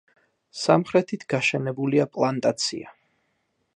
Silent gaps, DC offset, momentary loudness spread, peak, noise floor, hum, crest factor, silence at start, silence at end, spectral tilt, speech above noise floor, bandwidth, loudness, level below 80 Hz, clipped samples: none; under 0.1%; 8 LU; -4 dBFS; -73 dBFS; none; 22 dB; 0.55 s; 0.85 s; -5 dB/octave; 49 dB; 11 kHz; -23 LUFS; -70 dBFS; under 0.1%